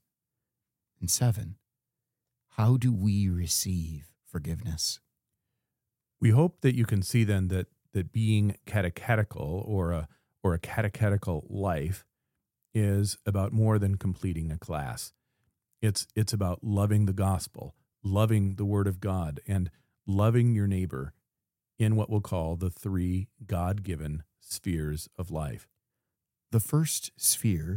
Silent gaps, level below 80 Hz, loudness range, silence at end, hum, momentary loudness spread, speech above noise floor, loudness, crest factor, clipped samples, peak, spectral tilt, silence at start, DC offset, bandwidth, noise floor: none; -48 dBFS; 4 LU; 0 s; none; 12 LU; 61 dB; -29 LUFS; 20 dB; under 0.1%; -10 dBFS; -5.5 dB/octave; 1 s; under 0.1%; 17 kHz; -89 dBFS